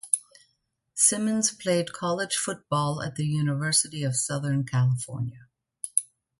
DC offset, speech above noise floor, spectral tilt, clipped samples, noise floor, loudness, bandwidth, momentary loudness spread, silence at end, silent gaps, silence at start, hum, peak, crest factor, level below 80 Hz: under 0.1%; 48 dB; -4 dB/octave; under 0.1%; -74 dBFS; -26 LUFS; 12 kHz; 9 LU; 0.35 s; none; 0.05 s; none; -2 dBFS; 26 dB; -64 dBFS